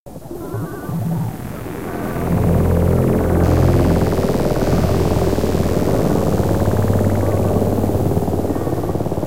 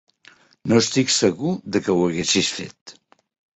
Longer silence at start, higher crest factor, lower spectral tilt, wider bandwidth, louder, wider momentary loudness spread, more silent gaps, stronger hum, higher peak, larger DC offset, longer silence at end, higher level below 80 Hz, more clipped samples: second, 0 s vs 0.65 s; about the same, 14 dB vs 18 dB; first, -7.5 dB/octave vs -3.5 dB/octave; first, 16 kHz vs 8.4 kHz; about the same, -18 LUFS vs -20 LUFS; about the same, 11 LU vs 13 LU; about the same, 0.00-0.06 s vs 2.81-2.86 s; neither; about the same, -2 dBFS vs -4 dBFS; first, 4% vs under 0.1%; second, 0 s vs 0.7 s; first, -28 dBFS vs -56 dBFS; neither